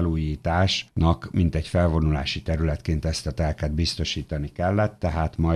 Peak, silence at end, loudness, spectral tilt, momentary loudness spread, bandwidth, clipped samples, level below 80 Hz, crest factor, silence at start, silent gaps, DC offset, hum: -10 dBFS; 0 s; -25 LUFS; -6 dB/octave; 5 LU; 11 kHz; under 0.1%; -32 dBFS; 14 dB; 0 s; none; under 0.1%; none